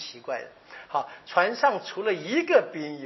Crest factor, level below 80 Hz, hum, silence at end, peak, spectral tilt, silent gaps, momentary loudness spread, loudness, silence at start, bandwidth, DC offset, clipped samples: 20 dB; -80 dBFS; none; 0 s; -6 dBFS; -2 dB/octave; none; 13 LU; -26 LUFS; 0 s; 6.2 kHz; under 0.1%; under 0.1%